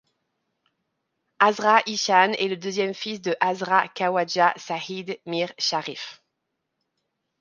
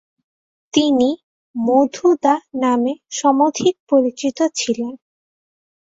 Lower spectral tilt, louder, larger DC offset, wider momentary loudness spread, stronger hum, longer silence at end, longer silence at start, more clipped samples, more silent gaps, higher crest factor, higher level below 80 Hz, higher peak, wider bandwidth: about the same, -3 dB/octave vs -3.5 dB/octave; second, -23 LUFS vs -18 LUFS; neither; first, 12 LU vs 8 LU; neither; first, 1.25 s vs 1 s; first, 1.4 s vs 0.75 s; neither; second, none vs 1.24-1.54 s, 3.80-3.87 s; first, 24 dB vs 18 dB; second, -78 dBFS vs -64 dBFS; about the same, -2 dBFS vs -2 dBFS; first, 9.8 kHz vs 8 kHz